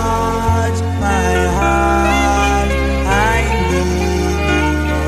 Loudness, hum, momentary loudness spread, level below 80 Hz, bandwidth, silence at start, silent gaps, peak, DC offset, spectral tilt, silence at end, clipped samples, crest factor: -15 LUFS; none; 3 LU; -20 dBFS; 14.5 kHz; 0 s; none; -2 dBFS; under 0.1%; -5.5 dB/octave; 0 s; under 0.1%; 12 dB